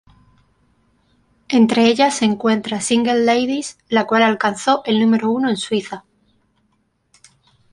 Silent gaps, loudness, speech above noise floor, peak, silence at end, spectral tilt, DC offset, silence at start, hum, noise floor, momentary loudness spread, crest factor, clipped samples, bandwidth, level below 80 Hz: none; -17 LUFS; 48 dB; -2 dBFS; 1.75 s; -4 dB/octave; under 0.1%; 1.5 s; none; -65 dBFS; 8 LU; 16 dB; under 0.1%; 11.5 kHz; -62 dBFS